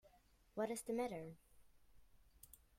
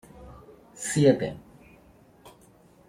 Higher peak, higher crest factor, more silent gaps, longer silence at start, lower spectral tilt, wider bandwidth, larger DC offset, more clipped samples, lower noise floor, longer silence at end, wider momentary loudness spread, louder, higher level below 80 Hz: second, -30 dBFS vs -6 dBFS; about the same, 20 dB vs 24 dB; neither; second, 0.05 s vs 0.2 s; about the same, -5 dB/octave vs -5.5 dB/octave; about the same, 16.5 kHz vs 16 kHz; neither; neither; first, -72 dBFS vs -56 dBFS; second, 0.25 s vs 0.6 s; second, 22 LU vs 27 LU; second, -45 LUFS vs -25 LUFS; second, -74 dBFS vs -58 dBFS